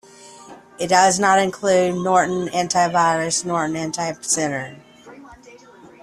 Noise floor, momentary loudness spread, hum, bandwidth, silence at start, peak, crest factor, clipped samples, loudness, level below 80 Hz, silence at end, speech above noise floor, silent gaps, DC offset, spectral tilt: -45 dBFS; 10 LU; none; 13 kHz; 0.2 s; -2 dBFS; 18 dB; under 0.1%; -19 LUFS; -60 dBFS; 0.15 s; 26 dB; none; under 0.1%; -3.5 dB/octave